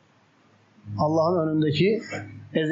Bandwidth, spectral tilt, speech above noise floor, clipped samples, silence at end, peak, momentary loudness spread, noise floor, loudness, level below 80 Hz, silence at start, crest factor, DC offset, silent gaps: 7.6 kHz; -5.5 dB/octave; 37 dB; under 0.1%; 0 s; -10 dBFS; 14 LU; -60 dBFS; -24 LUFS; -64 dBFS; 0.85 s; 14 dB; under 0.1%; none